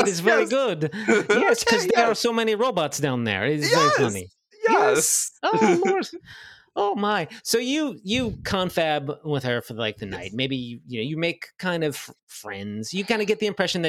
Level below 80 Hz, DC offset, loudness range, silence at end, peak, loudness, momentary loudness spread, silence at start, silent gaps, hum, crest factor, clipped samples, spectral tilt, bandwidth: -58 dBFS; under 0.1%; 7 LU; 0 s; -4 dBFS; -23 LUFS; 13 LU; 0 s; 12.23-12.27 s; none; 20 dB; under 0.1%; -3.5 dB/octave; 16 kHz